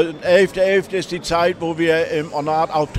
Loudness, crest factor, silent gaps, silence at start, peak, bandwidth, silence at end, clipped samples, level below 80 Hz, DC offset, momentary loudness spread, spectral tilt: -18 LUFS; 16 dB; none; 0 s; -2 dBFS; 14 kHz; 0 s; under 0.1%; -48 dBFS; under 0.1%; 7 LU; -5 dB/octave